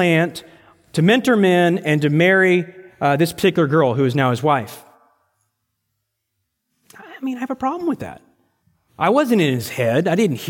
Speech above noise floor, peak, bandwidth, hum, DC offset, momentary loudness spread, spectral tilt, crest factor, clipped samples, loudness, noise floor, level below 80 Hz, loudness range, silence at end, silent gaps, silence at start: 58 dB; -2 dBFS; 17 kHz; none; under 0.1%; 12 LU; -6 dB/octave; 16 dB; under 0.1%; -17 LUFS; -75 dBFS; -60 dBFS; 13 LU; 0 s; none; 0 s